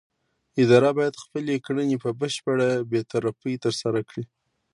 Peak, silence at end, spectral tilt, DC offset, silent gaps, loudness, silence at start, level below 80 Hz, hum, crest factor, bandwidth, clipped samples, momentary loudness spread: -4 dBFS; 0.5 s; -6 dB/octave; under 0.1%; none; -24 LUFS; 0.55 s; -68 dBFS; none; 20 dB; 11.5 kHz; under 0.1%; 13 LU